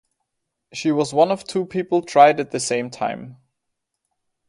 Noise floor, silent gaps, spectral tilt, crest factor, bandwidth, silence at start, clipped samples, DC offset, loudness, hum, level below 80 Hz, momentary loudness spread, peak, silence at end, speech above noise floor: -78 dBFS; none; -4.5 dB/octave; 20 dB; 11.5 kHz; 0.75 s; under 0.1%; under 0.1%; -19 LUFS; none; -66 dBFS; 13 LU; 0 dBFS; 1.15 s; 59 dB